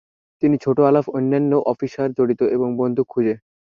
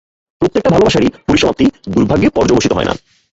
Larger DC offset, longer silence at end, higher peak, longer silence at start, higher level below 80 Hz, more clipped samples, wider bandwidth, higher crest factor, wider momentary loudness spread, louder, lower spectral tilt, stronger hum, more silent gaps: neither; about the same, 0.4 s vs 0.35 s; second, -4 dBFS vs 0 dBFS; about the same, 0.4 s vs 0.4 s; second, -62 dBFS vs -34 dBFS; neither; second, 7 kHz vs 8 kHz; about the same, 16 dB vs 12 dB; about the same, 7 LU vs 6 LU; second, -19 LUFS vs -13 LUFS; first, -9.5 dB/octave vs -5.5 dB/octave; neither; neither